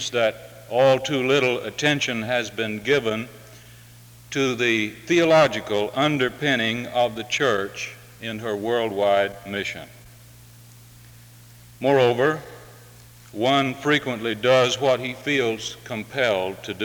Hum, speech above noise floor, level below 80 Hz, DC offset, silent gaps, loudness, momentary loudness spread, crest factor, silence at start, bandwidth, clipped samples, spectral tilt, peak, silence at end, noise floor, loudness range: none; 25 dB; -58 dBFS; under 0.1%; none; -22 LUFS; 12 LU; 18 dB; 0 s; over 20 kHz; under 0.1%; -4.5 dB/octave; -6 dBFS; 0 s; -47 dBFS; 5 LU